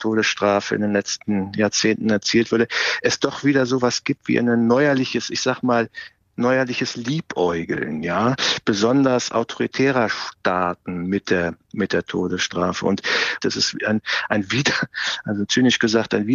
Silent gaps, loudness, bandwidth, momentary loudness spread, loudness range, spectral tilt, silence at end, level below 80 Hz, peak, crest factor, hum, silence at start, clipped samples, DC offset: none; -20 LUFS; 7.6 kHz; 7 LU; 3 LU; -4 dB/octave; 0 s; -60 dBFS; -6 dBFS; 16 dB; none; 0 s; under 0.1%; under 0.1%